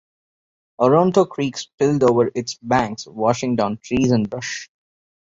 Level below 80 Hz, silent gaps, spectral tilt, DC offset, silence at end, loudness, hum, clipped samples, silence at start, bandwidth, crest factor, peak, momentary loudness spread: -52 dBFS; 1.74-1.78 s; -6 dB/octave; under 0.1%; 0.75 s; -19 LUFS; none; under 0.1%; 0.8 s; 7.8 kHz; 18 dB; -2 dBFS; 11 LU